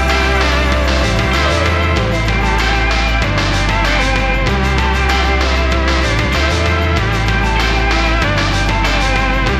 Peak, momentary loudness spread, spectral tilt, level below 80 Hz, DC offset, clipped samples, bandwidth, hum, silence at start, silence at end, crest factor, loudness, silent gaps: -2 dBFS; 1 LU; -5 dB/octave; -18 dBFS; under 0.1%; under 0.1%; 12.5 kHz; none; 0 s; 0 s; 12 dB; -14 LUFS; none